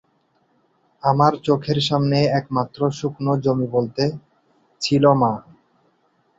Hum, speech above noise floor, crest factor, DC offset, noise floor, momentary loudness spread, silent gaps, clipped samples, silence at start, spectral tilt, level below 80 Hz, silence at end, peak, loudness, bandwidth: none; 45 dB; 20 dB; under 0.1%; -64 dBFS; 8 LU; none; under 0.1%; 1.05 s; -6.5 dB/octave; -56 dBFS; 1 s; -2 dBFS; -20 LUFS; 7.8 kHz